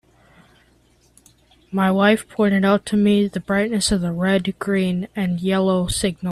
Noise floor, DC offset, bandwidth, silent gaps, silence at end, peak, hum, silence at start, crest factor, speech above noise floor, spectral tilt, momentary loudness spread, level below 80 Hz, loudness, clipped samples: -57 dBFS; under 0.1%; 13 kHz; none; 0 s; -2 dBFS; none; 1.7 s; 18 dB; 38 dB; -5.5 dB/octave; 6 LU; -44 dBFS; -19 LUFS; under 0.1%